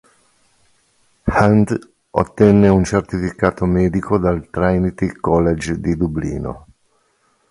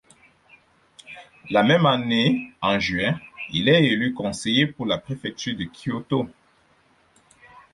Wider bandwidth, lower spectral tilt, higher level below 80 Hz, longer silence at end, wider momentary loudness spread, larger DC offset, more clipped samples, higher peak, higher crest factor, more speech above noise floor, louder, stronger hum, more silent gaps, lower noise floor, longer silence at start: about the same, 11.5 kHz vs 11.5 kHz; first, -8 dB/octave vs -5.5 dB/octave; first, -34 dBFS vs -56 dBFS; second, 0.9 s vs 1.45 s; about the same, 12 LU vs 14 LU; neither; neither; first, 0 dBFS vs -6 dBFS; about the same, 18 dB vs 18 dB; first, 46 dB vs 39 dB; first, -17 LUFS vs -22 LUFS; neither; neither; about the same, -62 dBFS vs -60 dBFS; first, 1.25 s vs 1.1 s